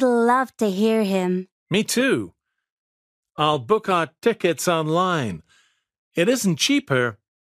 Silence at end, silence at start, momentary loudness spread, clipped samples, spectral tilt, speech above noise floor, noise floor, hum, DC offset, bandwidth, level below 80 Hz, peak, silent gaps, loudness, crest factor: 0.4 s; 0 s; 8 LU; under 0.1%; -4.5 dB/octave; 41 dB; -61 dBFS; none; under 0.1%; 15.5 kHz; -64 dBFS; -4 dBFS; 1.52-1.66 s, 2.72-3.23 s, 5.98-6.11 s; -21 LUFS; 18 dB